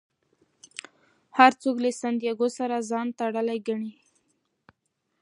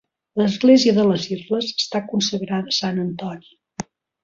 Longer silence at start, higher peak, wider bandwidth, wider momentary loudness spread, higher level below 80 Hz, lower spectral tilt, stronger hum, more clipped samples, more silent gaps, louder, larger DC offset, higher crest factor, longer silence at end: first, 1.35 s vs 0.35 s; about the same, -2 dBFS vs -2 dBFS; first, 11.5 kHz vs 7.6 kHz; about the same, 22 LU vs 21 LU; second, -82 dBFS vs -62 dBFS; about the same, -4 dB/octave vs -5 dB/octave; neither; neither; neither; second, -25 LUFS vs -19 LUFS; neither; first, 26 dB vs 18 dB; first, 1.3 s vs 0.4 s